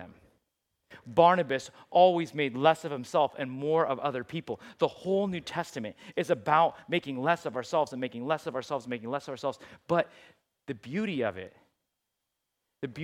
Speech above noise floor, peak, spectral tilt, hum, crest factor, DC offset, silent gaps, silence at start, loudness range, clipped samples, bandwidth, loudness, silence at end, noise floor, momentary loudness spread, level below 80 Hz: 55 dB; -8 dBFS; -5.5 dB/octave; none; 22 dB; under 0.1%; none; 0 s; 8 LU; under 0.1%; 14 kHz; -29 LUFS; 0 s; -84 dBFS; 15 LU; -72 dBFS